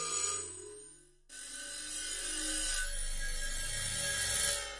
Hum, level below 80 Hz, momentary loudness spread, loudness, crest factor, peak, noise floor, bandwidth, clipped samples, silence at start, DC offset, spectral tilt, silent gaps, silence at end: none; -44 dBFS; 16 LU; -35 LUFS; 18 dB; -18 dBFS; -57 dBFS; 11.5 kHz; under 0.1%; 0 s; under 0.1%; 0 dB/octave; none; 0 s